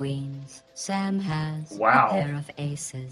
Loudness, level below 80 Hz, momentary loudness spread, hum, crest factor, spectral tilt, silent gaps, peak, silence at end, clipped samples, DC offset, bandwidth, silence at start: -26 LUFS; -60 dBFS; 16 LU; none; 22 dB; -5.5 dB/octave; none; -4 dBFS; 0 s; under 0.1%; under 0.1%; 14.5 kHz; 0 s